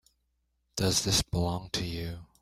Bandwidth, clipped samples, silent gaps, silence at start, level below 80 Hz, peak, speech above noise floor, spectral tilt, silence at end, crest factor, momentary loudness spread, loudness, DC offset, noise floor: 16 kHz; under 0.1%; none; 0.75 s; -48 dBFS; -12 dBFS; 46 dB; -3.5 dB/octave; 0.2 s; 20 dB; 13 LU; -29 LUFS; under 0.1%; -76 dBFS